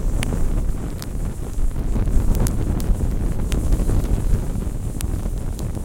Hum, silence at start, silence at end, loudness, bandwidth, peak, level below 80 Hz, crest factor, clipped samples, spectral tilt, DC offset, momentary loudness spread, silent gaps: none; 0 s; 0 s; -25 LUFS; 16.5 kHz; 0 dBFS; -22 dBFS; 20 dB; under 0.1%; -6.5 dB/octave; under 0.1%; 7 LU; none